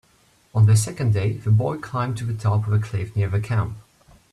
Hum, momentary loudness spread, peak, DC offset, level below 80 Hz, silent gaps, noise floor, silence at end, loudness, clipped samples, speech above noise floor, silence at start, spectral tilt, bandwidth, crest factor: none; 9 LU; -8 dBFS; under 0.1%; -50 dBFS; none; -59 dBFS; 0.5 s; -22 LUFS; under 0.1%; 38 dB; 0.55 s; -6.5 dB/octave; 13 kHz; 14 dB